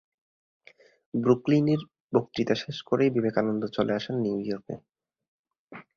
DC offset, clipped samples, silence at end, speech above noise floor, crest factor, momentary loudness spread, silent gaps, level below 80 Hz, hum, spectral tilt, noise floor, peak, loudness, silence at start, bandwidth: under 0.1%; under 0.1%; 0.15 s; 23 dB; 22 dB; 11 LU; 2.00-2.09 s, 5.28-5.44 s, 5.59-5.68 s; -66 dBFS; none; -7.5 dB/octave; -49 dBFS; -6 dBFS; -27 LUFS; 1.15 s; 7.2 kHz